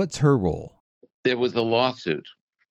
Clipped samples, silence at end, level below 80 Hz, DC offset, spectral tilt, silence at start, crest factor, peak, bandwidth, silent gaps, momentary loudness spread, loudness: under 0.1%; 0.4 s; -52 dBFS; under 0.1%; -6 dB/octave; 0 s; 18 dB; -6 dBFS; 10.5 kHz; 0.80-1.01 s, 1.14-1.23 s; 11 LU; -24 LUFS